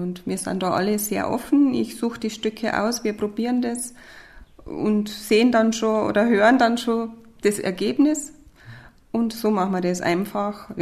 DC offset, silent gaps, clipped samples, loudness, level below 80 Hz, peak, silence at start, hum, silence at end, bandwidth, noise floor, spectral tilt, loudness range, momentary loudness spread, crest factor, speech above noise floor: under 0.1%; none; under 0.1%; -22 LUFS; -54 dBFS; -4 dBFS; 0 s; none; 0 s; 14 kHz; -44 dBFS; -5 dB/octave; 5 LU; 10 LU; 18 dB; 23 dB